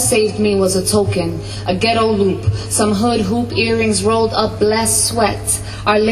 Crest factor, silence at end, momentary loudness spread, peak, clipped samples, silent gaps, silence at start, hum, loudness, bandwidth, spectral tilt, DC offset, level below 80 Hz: 14 dB; 0 s; 5 LU; 0 dBFS; under 0.1%; none; 0 s; none; -15 LUFS; 13.5 kHz; -4 dB/octave; under 0.1%; -36 dBFS